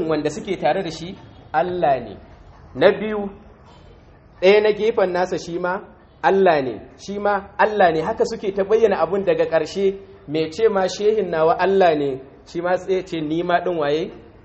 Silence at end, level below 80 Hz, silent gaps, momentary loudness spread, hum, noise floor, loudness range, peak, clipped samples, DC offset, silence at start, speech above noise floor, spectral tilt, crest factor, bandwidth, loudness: 0.25 s; -50 dBFS; none; 14 LU; none; -47 dBFS; 3 LU; 0 dBFS; under 0.1%; under 0.1%; 0 s; 28 dB; -5.5 dB/octave; 20 dB; 8.2 kHz; -20 LUFS